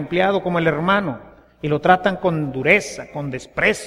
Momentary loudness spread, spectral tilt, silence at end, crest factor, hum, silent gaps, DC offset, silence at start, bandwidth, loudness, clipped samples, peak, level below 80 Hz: 13 LU; -5.5 dB/octave; 0 s; 20 dB; none; none; under 0.1%; 0 s; 14 kHz; -19 LUFS; under 0.1%; 0 dBFS; -48 dBFS